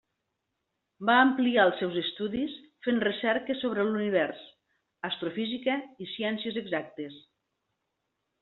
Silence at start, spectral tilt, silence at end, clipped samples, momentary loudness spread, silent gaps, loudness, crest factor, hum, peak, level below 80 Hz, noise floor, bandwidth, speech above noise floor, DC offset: 1 s; -2.5 dB/octave; 1.2 s; under 0.1%; 13 LU; none; -28 LUFS; 22 dB; none; -8 dBFS; -72 dBFS; -82 dBFS; 4.3 kHz; 54 dB; under 0.1%